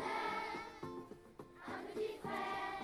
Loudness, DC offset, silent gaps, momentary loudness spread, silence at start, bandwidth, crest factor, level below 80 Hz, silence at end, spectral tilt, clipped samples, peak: -44 LUFS; under 0.1%; none; 14 LU; 0 s; over 20 kHz; 16 dB; -72 dBFS; 0 s; -4.5 dB/octave; under 0.1%; -28 dBFS